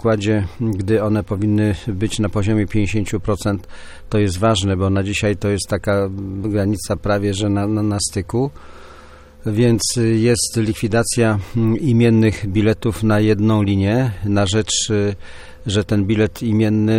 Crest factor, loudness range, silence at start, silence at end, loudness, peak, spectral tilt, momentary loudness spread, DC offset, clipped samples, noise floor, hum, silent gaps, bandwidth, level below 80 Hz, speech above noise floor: 14 dB; 4 LU; 0 s; 0 s; -18 LUFS; -2 dBFS; -5.5 dB/octave; 6 LU; under 0.1%; under 0.1%; -41 dBFS; none; none; 15.5 kHz; -38 dBFS; 23 dB